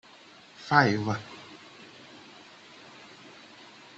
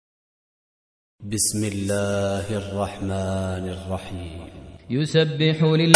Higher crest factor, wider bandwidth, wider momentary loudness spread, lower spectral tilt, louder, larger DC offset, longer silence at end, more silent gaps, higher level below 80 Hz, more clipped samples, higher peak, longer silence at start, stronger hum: about the same, 28 dB vs 24 dB; second, 8.2 kHz vs 11 kHz; first, 27 LU vs 16 LU; about the same, -5.5 dB/octave vs -5 dB/octave; about the same, -25 LUFS vs -24 LUFS; neither; first, 2.4 s vs 0 s; neither; second, -70 dBFS vs -50 dBFS; neither; second, -6 dBFS vs 0 dBFS; second, 0.6 s vs 1.2 s; neither